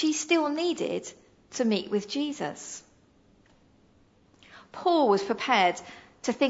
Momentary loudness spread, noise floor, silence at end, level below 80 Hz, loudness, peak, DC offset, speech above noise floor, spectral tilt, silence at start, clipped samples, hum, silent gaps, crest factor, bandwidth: 17 LU; -61 dBFS; 0 s; -70 dBFS; -27 LUFS; -8 dBFS; under 0.1%; 35 dB; -3.5 dB/octave; 0 s; under 0.1%; none; none; 20 dB; 8 kHz